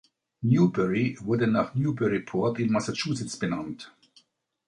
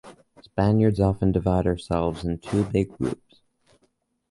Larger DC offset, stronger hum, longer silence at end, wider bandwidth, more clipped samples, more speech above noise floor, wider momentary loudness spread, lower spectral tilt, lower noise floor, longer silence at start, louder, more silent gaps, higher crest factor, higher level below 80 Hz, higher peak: neither; neither; second, 0.8 s vs 1.15 s; about the same, 11 kHz vs 11.5 kHz; neither; second, 38 dB vs 47 dB; about the same, 10 LU vs 10 LU; second, -6.5 dB/octave vs -8.5 dB/octave; second, -64 dBFS vs -69 dBFS; first, 0.4 s vs 0.05 s; about the same, -26 LUFS vs -24 LUFS; neither; about the same, 18 dB vs 16 dB; second, -60 dBFS vs -40 dBFS; about the same, -10 dBFS vs -8 dBFS